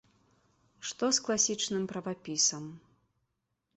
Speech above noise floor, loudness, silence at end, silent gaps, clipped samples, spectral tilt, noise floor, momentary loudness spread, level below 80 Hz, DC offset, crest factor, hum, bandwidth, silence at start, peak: 50 dB; -30 LUFS; 1 s; none; under 0.1%; -2 dB/octave; -82 dBFS; 14 LU; -74 dBFS; under 0.1%; 20 dB; none; 8.4 kHz; 0.8 s; -14 dBFS